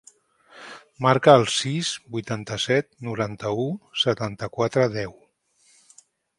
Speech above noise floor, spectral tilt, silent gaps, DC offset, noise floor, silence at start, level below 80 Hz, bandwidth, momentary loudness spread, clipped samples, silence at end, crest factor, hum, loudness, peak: 40 dB; -4.5 dB/octave; none; under 0.1%; -62 dBFS; 0.55 s; -60 dBFS; 11.5 kHz; 17 LU; under 0.1%; 1.25 s; 24 dB; none; -23 LUFS; 0 dBFS